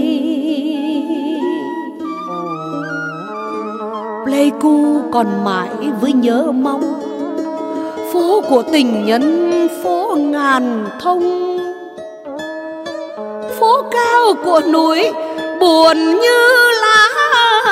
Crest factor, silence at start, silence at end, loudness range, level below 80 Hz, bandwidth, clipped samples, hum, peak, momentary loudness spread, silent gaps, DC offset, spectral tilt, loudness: 14 dB; 0 s; 0 s; 9 LU; -62 dBFS; 16 kHz; under 0.1%; none; 0 dBFS; 15 LU; none; under 0.1%; -4 dB/octave; -14 LUFS